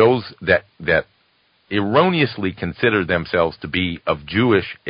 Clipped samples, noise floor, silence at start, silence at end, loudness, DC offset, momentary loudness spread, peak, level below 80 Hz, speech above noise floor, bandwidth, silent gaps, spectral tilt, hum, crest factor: under 0.1%; -61 dBFS; 0 s; 0 s; -19 LUFS; under 0.1%; 7 LU; 0 dBFS; -42 dBFS; 42 dB; 5.4 kHz; none; -11 dB/octave; none; 18 dB